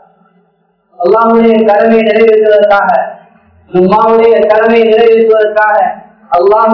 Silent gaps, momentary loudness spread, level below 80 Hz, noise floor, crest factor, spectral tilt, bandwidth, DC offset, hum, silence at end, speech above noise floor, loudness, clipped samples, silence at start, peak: none; 8 LU; -48 dBFS; -55 dBFS; 8 dB; -8 dB/octave; 5.4 kHz; under 0.1%; none; 0 s; 48 dB; -7 LUFS; 3%; 1 s; 0 dBFS